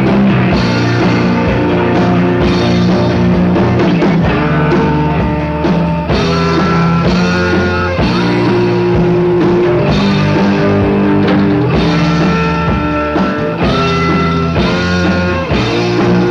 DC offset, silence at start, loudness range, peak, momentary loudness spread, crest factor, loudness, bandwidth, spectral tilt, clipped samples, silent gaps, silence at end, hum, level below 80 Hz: under 0.1%; 0 s; 1 LU; 0 dBFS; 3 LU; 10 dB; -11 LUFS; 7.2 kHz; -7.5 dB/octave; under 0.1%; none; 0 s; none; -28 dBFS